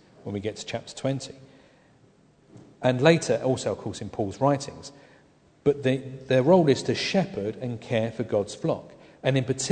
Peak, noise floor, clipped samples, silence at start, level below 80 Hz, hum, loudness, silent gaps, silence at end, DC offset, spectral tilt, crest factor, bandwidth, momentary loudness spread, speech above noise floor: -4 dBFS; -59 dBFS; under 0.1%; 0.25 s; -60 dBFS; none; -26 LUFS; none; 0 s; under 0.1%; -5.5 dB/octave; 22 dB; 9.4 kHz; 14 LU; 34 dB